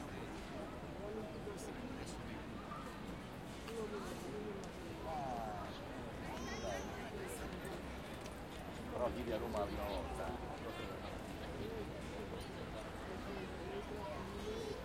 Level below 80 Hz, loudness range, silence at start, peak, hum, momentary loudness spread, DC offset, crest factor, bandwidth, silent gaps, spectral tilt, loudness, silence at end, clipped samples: -56 dBFS; 4 LU; 0 s; -26 dBFS; none; 7 LU; under 0.1%; 18 dB; 16 kHz; none; -5.5 dB/octave; -46 LUFS; 0 s; under 0.1%